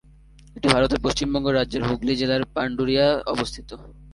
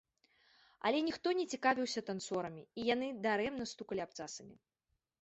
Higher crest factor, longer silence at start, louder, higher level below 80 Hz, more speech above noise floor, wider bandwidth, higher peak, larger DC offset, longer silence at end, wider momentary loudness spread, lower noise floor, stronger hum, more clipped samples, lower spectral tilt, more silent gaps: about the same, 24 dB vs 22 dB; second, 0.55 s vs 0.85 s; first, -22 LUFS vs -37 LUFS; first, -40 dBFS vs -74 dBFS; second, 27 dB vs 48 dB; first, 11.5 kHz vs 8 kHz; first, 0 dBFS vs -18 dBFS; neither; second, 0 s vs 0.65 s; about the same, 10 LU vs 11 LU; second, -49 dBFS vs -86 dBFS; neither; neither; first, -5 dB/octave vs -2.5 dB/octave; neither